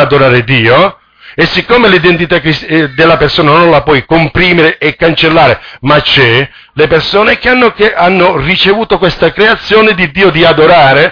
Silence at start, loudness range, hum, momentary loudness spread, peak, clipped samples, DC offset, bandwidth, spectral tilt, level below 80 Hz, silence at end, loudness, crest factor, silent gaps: 0 s; 1 LU; none; 5 LU; 0 dBFS; 1%; under 0.1%; 5.4 kHz; -7 dB/octave; -30 dBFS; 0 s; -6 LUFS; 6 dB; none